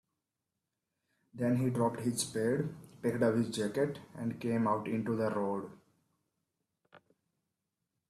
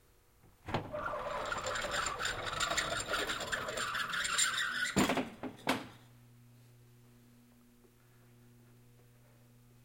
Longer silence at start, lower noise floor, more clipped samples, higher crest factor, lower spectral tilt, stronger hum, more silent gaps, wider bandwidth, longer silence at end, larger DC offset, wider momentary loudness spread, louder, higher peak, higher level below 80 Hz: first, 1.35 s vs 0.45 s; first, -88 dBFS vs -64 dBFS; neither; second, 18 dB vs 24 dB; first, -6 dB/octave vs -2 dB/octave; neither; neither; second, 14.5 kHz vs 17 kHz; about the same, 1.1 s vs 1.1 s; neither; about the same, 8 LU vs 9 LU; about the same, -34 LUFS vs -35 LUFS; about the same, -18 dBFS vs -16 dBFS; second, -72 dBFS vs -60 dBFS